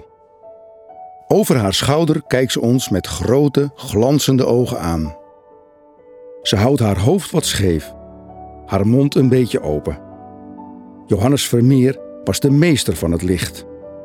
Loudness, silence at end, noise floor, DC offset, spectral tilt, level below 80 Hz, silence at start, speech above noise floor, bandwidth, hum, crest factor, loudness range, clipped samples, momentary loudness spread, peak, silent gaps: -16 LUFS; 0 s; -47 dBFS; under 0.1%; -5.5 dB/octave; -40 dBFS; 0.45 s; 32 dB; 17.5 kHz; none; 16 dB; 3 LU; under 0.1%; 21 LU; 0 dBFS; none